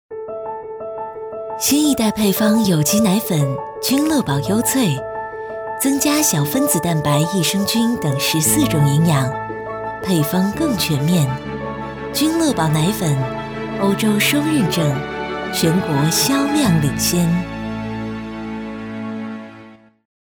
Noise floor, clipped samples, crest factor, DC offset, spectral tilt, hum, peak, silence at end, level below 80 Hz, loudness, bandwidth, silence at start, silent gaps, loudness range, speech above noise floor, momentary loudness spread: -42 dBFS; under 0.1%; 16 dB; under 0.1%; -4.5 dB/octave; none; -2 dBFS; 0.45 s; -44 dBFS; -18 LUFS; over 20 kHz; 0.1 s; none; 3 LU; 26 dB; 13 LU